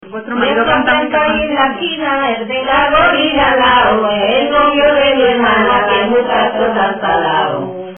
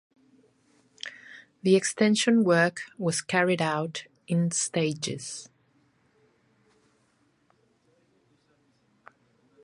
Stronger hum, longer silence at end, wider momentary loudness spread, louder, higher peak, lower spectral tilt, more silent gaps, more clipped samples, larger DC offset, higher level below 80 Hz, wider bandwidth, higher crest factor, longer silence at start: neither; second, 0 s vs 4.2 s; second, 6 LU vs 19 LU; first, -12 LUFS vs -26 LUFS; first, 0 dBFS vs -8 dBFS; first, -8.5 dB/octave vs -4.5 dB/octave; neither; neither; neither; first, -38 dBFS vs -74 dBFS; second, 3.5 kHz vs 11.5 kHz; second, 12 dB vs 20 dB; second, 0 s vs 1.05 s